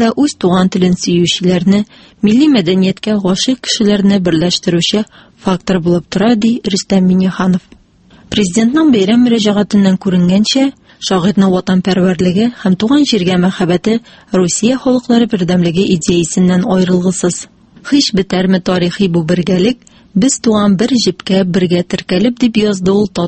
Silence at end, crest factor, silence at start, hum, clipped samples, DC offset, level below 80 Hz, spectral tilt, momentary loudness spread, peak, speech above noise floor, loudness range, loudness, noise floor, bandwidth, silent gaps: 0 s; 12 dB; 0 s; none; under 0.1%; under 0.1%; -42 dBFS; -5.5 dB/octave; 5 LU; 0 dBFS; 32 dB; 2 LU; -12 LUFS; -44 dBFS; 8.8 kHz; none